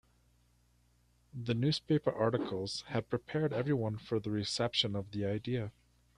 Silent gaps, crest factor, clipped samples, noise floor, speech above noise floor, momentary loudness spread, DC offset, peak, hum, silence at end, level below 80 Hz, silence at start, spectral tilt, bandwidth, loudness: none; 20 dB; under 0.1%; -70 dBFS; 36 dB; 7 LU; under 0.1%; -16 dBFS; 60 Hz at -60 dBFS; 0.45 s; -66 dBFS; 1.35 s; -6 dB/octave; 11 kHz; -35 LUFS